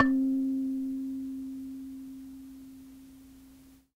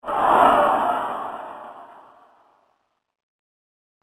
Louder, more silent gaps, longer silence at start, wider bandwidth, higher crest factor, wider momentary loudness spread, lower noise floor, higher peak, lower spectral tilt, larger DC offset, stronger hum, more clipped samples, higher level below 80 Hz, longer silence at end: second, -33 LUFS vs -19 LUFS; neither; about the same, 0 s vs 0.05 s; about the same, 15.5 kHz vs 15 kHz; about the same, 24 dB vs 22 dB; about the same, 24 LU vs 23 LU; second, -56 dBFS vs -70 dBFS; second, -8 dBFS vs -2 dBFS; first, -6 dB/octave vs -4.5 dB/octave; neither; neither; neither; about the same, -62 dBFS vs -58 dBFS; second, 0.25 s vs 2.15 s